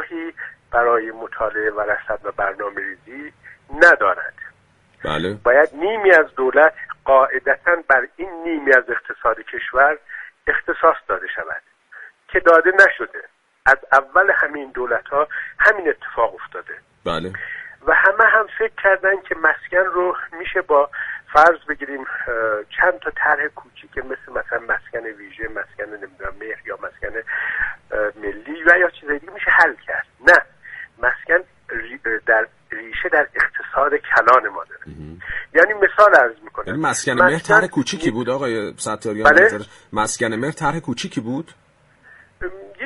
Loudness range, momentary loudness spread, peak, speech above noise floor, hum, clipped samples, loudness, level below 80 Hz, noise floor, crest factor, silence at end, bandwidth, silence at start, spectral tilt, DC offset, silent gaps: 7 LU; 18 LU; 0 dBFS; 38 dB; none; under 0.1%; -17 LUFS; -48 dBFS; -56 dBFS; 18 dB; 0 s; 11.5 kHz; 0 s; -4 dB/octave; under 0.1%; none